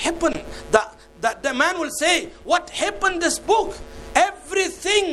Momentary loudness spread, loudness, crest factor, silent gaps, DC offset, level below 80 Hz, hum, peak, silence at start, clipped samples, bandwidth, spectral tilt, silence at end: 6 LU; -21 LUFS; 22 dB; none; under 0.1%; -44 dBFS; none; 0 dBFS; 0 s; under 0.1%; 14 kHz; -1.5 dB/octave; 0 s